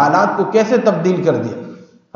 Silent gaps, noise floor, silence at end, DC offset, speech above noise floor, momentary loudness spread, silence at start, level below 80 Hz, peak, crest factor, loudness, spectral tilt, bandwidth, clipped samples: none; -37 dBFS; 0.35 s; under 0.1%; 23 dB; 14 LU; 0 s; -68 dBFS; 0 dBFS; 14 dB; -15 LUFS; -6.5 dB/octave; 7.2 kHz; under 0.1%